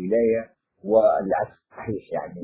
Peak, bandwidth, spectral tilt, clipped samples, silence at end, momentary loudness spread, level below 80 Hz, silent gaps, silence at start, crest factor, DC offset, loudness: -6 dBFS; 4 kHz; -11.5 dB/octave; under 0.1%; 0 s; 18 LU; -58 dBFS; none; 0 s; 18 dB; under 0.1%; -23 LUFS